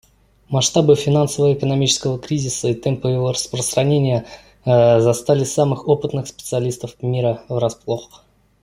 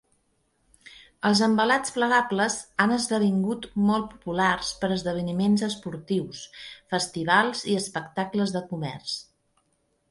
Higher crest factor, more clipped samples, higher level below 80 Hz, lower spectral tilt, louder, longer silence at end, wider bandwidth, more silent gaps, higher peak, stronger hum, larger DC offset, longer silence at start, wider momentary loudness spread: about the same, 16 dB vs 20 dB; neither; first, -50 dBFS vs -58 dBFS; about the same, -5.5 dB/octave vs -4.5 dB/octave; first, -18 LUFS vs -25 LUFS; second, 0.6 s vs 0.9 s; first, 15.5 kHz vs 11.5 kHz; neither; first, -2 dBFS vs -6 dBFS; neither; neither; second, 0.5 s vs 0.85 s; about the same, 10 LU vs 11 LU